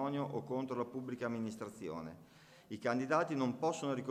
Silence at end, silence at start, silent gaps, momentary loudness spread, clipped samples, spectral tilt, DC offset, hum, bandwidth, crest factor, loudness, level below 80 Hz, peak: 0 s; 0 s; none; 12 LU; under 0.1%; -6 dB/octave; under 0.1%; none; 15.5 kHz; 20 dB; -39 LUFS; -76 dBFS; -18 dBFS